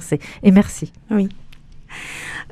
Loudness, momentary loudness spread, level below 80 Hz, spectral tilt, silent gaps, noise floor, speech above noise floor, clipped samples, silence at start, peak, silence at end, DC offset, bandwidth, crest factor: -18 LUFS; 18 LU; -42 dBFS; -6.5 dB/octave; none; -39 dBFS; 22 dB; under 0.1%; 0 s; 0 dBFS; 0.1 s; under 0.1%; 13.5 kHz; 20 dB